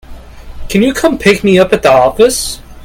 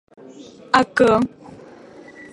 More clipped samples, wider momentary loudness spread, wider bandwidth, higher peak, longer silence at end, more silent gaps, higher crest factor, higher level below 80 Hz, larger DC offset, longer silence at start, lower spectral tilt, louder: first, 0.3% vs under 0.1%; second, 8 LU vs 13 LU; first, 17 kHz vs 11.5 kHz; about the same, 0 dBFS vs 0 dBFS; second, 0 s vs 1.05 s; neither; second, 10 dB vs 20 dB; first, -30 dBFS vs -52 dBFS; neither; second, 0.1 s vs 0.4 s; about the same, -4.5 dB/octave vs -5 dB/octave; first, -10 LUFS vs -18 LUFS